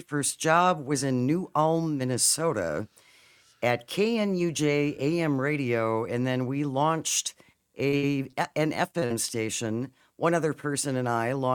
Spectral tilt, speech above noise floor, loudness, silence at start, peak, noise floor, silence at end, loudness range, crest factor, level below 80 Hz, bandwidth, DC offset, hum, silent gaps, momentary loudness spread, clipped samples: -4.5 dB/octave; 32 dB; -27 LUFS; 0.1 s; -8 dBFS; -59 dBFS; 0 s; 3 LU; 20 dB; -68 dBFS; 19 kHz; under 0.1%; none; none; 7 LU; under 0.1%